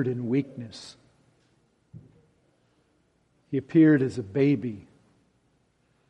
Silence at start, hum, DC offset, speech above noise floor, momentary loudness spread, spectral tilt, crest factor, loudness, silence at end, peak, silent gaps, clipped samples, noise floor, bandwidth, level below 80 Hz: 0 s; none; under 0.1%; 44 dB; 23 LU; -8.5 dB/octave; 20 dB; -24 LUFS; 1.3 s; -10 dBFS; none; under 0.1%; -68 dBFS; 9 kHz; -70 dBFS